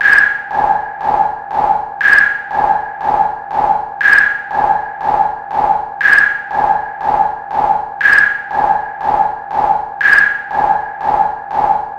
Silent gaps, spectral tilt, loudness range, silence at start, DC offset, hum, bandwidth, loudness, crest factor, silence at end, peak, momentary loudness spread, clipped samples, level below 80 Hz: none; -4 dB/octave; 1 LU; 0 s; under 0.1%; none; 12 kHz; -13 LUFS; 14 dB; 0 s; 0 dBFS; 8 LU; under 0.1%; -44 dBFS